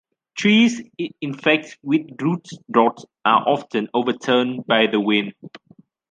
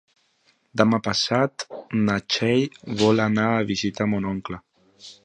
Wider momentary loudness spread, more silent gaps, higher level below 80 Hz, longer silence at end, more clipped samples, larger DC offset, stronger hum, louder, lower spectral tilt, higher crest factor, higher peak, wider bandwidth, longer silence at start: about the same, 11 LU vs 11 LU; neither; second, -68 dBFS vs -56 dBFS; first, 0.55 s vs 0.1 s; neither; neither; neither; about the same, -20 LUFS vs -22 LUFS; about the same, -5 dB/octave vs -5 dB/octave; about the same, 18 dB vs 22 dB; about the same, -2 dBFS vs -2 dBFS; about the same, 9 kHz vs 9.6 kHz; second, 0.35 s vs 0.75 s